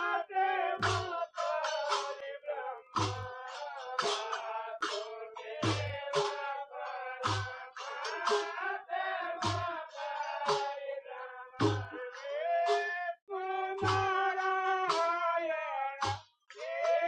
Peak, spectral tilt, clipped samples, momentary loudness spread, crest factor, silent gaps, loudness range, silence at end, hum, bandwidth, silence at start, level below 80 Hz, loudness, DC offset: -16 dBFS; -4 dB/octave; under 0.1%; 11 LU; 18 dB; 13.22-13.27 s; 4 LU; 0 s; none; 10.5 kHz; 0 s; -68 dBFS; -35 LUFS; under 0.1%